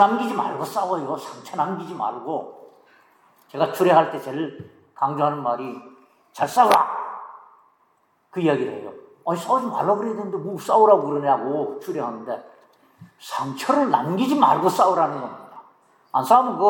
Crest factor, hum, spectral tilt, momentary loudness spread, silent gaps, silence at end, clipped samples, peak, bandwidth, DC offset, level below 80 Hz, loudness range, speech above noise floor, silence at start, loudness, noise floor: 20 dB; none; -5.5 dB/octave; 17 LU; none; 0 s; under 0.1%; -2 dBFS; 17.5 kHz; under 0.1%; -78 dBFS; 4 LU; 43 dB; 0 s; -22 LUFS; -64 dBFS